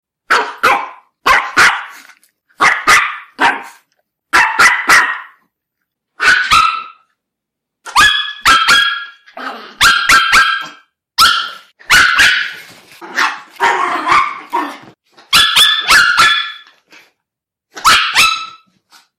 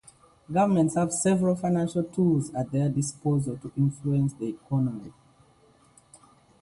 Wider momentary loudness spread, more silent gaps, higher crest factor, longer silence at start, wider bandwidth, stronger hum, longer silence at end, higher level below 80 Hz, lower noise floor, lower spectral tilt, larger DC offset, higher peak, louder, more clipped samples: first, 16 LU vs 6 LU; neither; about the same, 14 dB vs 16 dB; second, 0.3 s vs 0.5 s; first, 16.5 kHz vs 11.5 kHz; neither; second, 0.7 s vs 1.5 s; first, -42 dBFS vs -60 dBFS; first, -79 dBFS vs -60 dBFS; second, 0.5 dB/octave vs -7 dB/octave; neither; first, 0 dBFS vs -12 dBFS; first, -10 LUFS vs -26 LUFS; neither